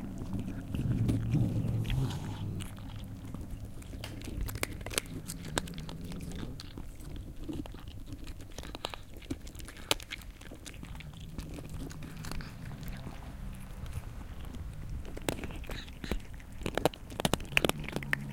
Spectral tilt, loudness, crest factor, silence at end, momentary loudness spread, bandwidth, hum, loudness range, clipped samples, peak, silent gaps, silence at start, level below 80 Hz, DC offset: -4.5 dB/octave; -38 LUFS; 32 dB; 0 s; 15 LU; 17 kHz; none; 9 LU; under 0.1%; -4 dBFS; none; 0 s; -44 dBFS; under 0.1%